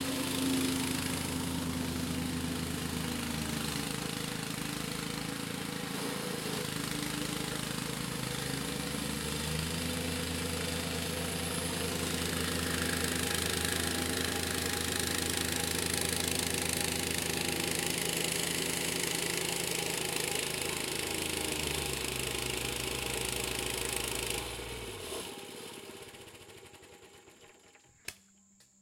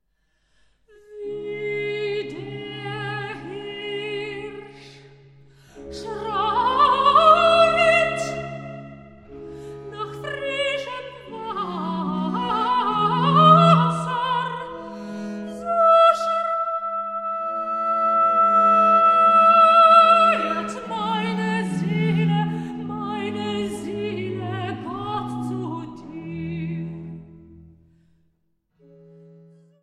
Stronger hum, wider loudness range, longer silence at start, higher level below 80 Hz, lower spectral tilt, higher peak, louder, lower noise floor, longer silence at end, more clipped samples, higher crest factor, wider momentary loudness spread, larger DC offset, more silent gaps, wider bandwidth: neither; second, 5 LU vs 17 LU; second, 0 s vs 1.1 s; about the same, -54 dBFS vs -56 dBFS; second, -3 dB/octave vs -6 dB/octave; second, -14 dBFS vs -2 dBFS; second, -33 LUFS vs -19 LUFS; second, -64 dBFS vs -69 dBFS; second, 0.65 s vs 2.2 s; neither; about the same, 20 dB vs 20 dB; second, 9 LU vs 20 LU; neither; neither; first, 17 kHz vs 11 kHz